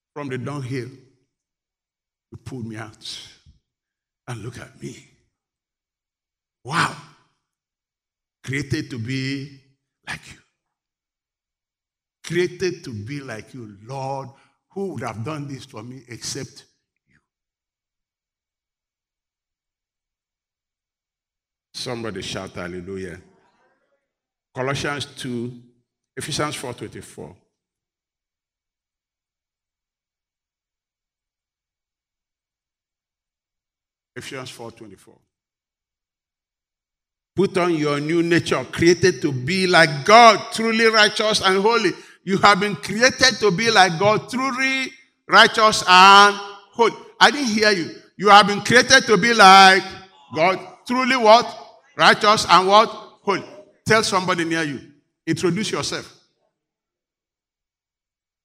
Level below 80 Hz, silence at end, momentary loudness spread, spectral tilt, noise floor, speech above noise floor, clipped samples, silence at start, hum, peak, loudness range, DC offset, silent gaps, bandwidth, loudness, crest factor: -58 dBFS; 2.35 s; 22 LU; -3.5 dB/octave; under -90 dBFS; over 72 dB; under 0.1%; 0.15 s; none; 0 dBFS; 21 LU; under 0.1%; none; 16 kHz; -16 LUFS; 22 dB